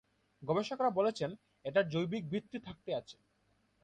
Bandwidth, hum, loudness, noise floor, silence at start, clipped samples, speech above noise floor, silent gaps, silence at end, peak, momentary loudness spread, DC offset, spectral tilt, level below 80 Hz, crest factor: 9.4 kHz; none; -36 LUFS; -75 dBFS; 0.4 s; under 0.1%; 39 dB; none; 0.7 s; -18 dBFS; 14 LU; under 0.1%; -6.5 dB/octave; -72 dBFS; 18 dB